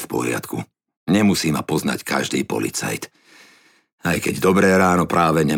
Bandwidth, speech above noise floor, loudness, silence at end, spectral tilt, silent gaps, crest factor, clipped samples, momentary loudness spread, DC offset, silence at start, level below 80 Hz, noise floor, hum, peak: 18 kHz; 35 dB; -19 LUFS; 0 s; -5 dB/octave; 0.97-1.06 s, 3.92-3.98 s; 16 dB; under 0.1%; 15 LU; under 0.1%; 0 s; -50 dBFS; -54 dBFS; none; -4 dBFS